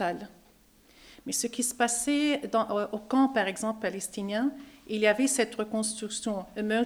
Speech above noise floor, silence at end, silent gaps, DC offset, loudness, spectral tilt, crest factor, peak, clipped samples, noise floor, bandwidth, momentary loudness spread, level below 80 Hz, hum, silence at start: 31 dB; 0 s; none; under 0.1%; -29 LUFS; -3 dB/octave; 18 dB; -12 dBFS; under 0.1%; -60 dBFS; over 20 kHz; 9 LU; -64 dBFS; none; 0 s